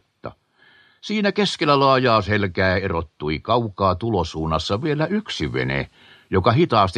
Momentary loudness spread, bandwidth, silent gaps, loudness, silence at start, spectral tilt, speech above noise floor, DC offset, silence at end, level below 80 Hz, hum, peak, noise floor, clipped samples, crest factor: 10 LU; 10 kHz; none; -20 LUFS; 0.25 s; -6 dB/octave; 35 dB; under 0.1%; 0 s; -44 dBFS; none; -2 dBFS; -55 dBFS; under 0.1%; 20 dB